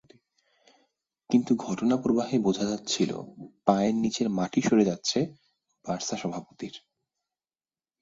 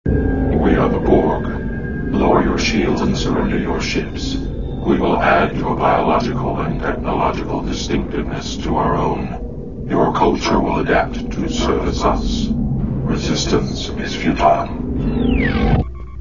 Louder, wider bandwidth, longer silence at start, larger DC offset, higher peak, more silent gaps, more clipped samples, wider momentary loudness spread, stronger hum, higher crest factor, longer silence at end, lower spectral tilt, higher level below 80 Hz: second, -27 LUFS vs -18 LUFS; about the same, 7.8 kHz vs 7.4 kHz; first, 1.3 s vs 0.05 s; second, under 0.1% vs 2%; second, -6 dBFS vs 0 dBFS; neither; neither; first, 16 LU vs 8 LU; neither; about the same, 22 dB vs 18 dB; first, 1.25 s vs 0 s; about the same, -5 dB/octave vs -6 dB/octave; second, -66 dBFS vs -26 dBFS